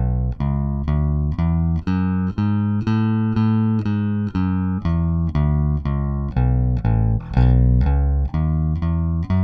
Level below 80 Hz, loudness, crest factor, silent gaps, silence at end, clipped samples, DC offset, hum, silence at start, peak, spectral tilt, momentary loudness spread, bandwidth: -24 dBFS; -20 LUFS; 14 dB; none; 0 s; under 0.1%; under 0.1%; none; 0 s; -4 dBFS; -10.5 dB/octave; 4 LU; 5 kHz